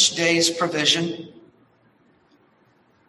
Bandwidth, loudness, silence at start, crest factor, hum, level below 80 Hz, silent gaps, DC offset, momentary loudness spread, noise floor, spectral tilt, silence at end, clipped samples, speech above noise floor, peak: 12.5 kHz; -19 LUFS; 0 s; 20 dB; none; -68 dBFS; none; under 0.1%; 17 LU; -60 dBFS; -2 dB/octave; 1.8 s; under 0.1%; 38 dB; -4 dBFS